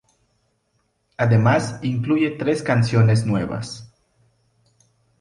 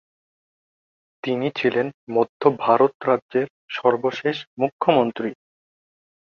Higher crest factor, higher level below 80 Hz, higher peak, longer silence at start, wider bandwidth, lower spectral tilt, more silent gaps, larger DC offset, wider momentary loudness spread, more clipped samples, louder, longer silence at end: about the same, 16 dB vs 20 dB; first, -52 dBFS vs -68 dBFS; second, -6 dBFS vs -2 dBFS; about the same, 1.2 s vs 1.25 s; first, 10.5 kHz vs 6.8 kHz; about the same, -7 dB/octave vs -7 dB/octave; second, none vs 1.94-2.07 s, 2.29-2.40 s, 2.95-3.00 s, 3.22-3.29 s, 3.50-3.68 s, 4.47-4.57 s, 4.72-4.79 s; neither; first, 14 LU vs 9 LU; neither; about the same, -20 LUFS vs -22 LUFS; first, 1.35 s vs 0.95 s